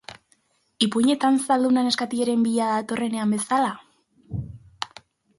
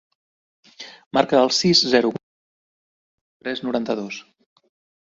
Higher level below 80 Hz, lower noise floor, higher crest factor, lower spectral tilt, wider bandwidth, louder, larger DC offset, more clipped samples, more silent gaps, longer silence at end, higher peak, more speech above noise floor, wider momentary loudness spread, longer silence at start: first, -56 dBFS vs -62 dBFS; second, -65 dBFS vs under -90 dBFS; about the same, 20 dB vs 22 dB; about the same, -4.5 dB/octave vs -4 dB/octave; first, 11.5 kHz vs 7.8 kHz; second, -22 LUFS vs -19 LUFS; neither; neither; second, none vs 1.06-1.11 s, 2.23-3.40 s; second, 0.5 s vs 0.85 s; about the same, -4 dBFS vs -2 dBFS; second, 43 dB vs over 71 dB; second, 15 LU vs 22 LU; second, 0.1 s vs 0.8 s